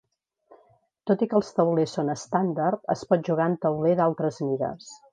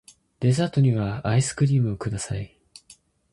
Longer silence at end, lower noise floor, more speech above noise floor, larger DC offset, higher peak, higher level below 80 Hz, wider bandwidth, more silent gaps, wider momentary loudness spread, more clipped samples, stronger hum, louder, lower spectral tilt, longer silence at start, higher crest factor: second, 0.15 s vs 0.85 s; first, -62 dBFS vs -55 dBFS; first, 38 dB vs 33 dB; neither; first, -6 dBFS vs -10 dBFS; second, -68 dBFS vs -50 dBFS; second, 9.8 kHz vs 11.5 kHz; neither; second, 6 LU vs 10 LU; neither; neither; about the same, -25 LUFS vs -24 LUFS; about the same, -7 dB/octave vs -6.5 dB/octave; first, 1.05 s vs 0.4 s; about the same, 18 dB vs 14 dB